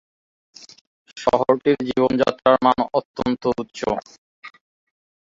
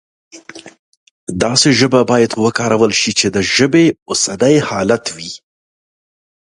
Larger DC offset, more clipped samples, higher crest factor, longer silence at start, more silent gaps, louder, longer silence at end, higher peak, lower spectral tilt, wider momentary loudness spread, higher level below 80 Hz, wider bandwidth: neither; neither; about the same, 20 dB vs 16 dB; first, 1.15 s vs 0.35 s; second, 3.05-3.14 s, 4.18-4.43 s vs 0.79-1.27 s, 4.02-4.06 s; second, -20 LUFS vs -13 LUFS; second, 0.85 s vs 1.2 s; about the same, -2 dBFS vs 0 dBFS; first, -6 dB/octave vs -4 dB/octave; second, 9 LU vs 16 LU; second, -54 dBFS vs -48 dBFS; second, 7.8 kHz vs 11.5 kHz